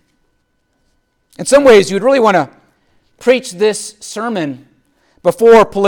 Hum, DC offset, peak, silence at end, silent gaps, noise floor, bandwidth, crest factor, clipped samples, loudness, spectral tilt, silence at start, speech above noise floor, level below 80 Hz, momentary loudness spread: none; under 0.1%; 0 dBFS; 0 s; none; -62 dBFS; 17.5 kHz; 12 dB; under 0.1%; -12 LUFS; -4 dB/octave; 1.4 s; 52 dB; -48 dBFS; 16 LU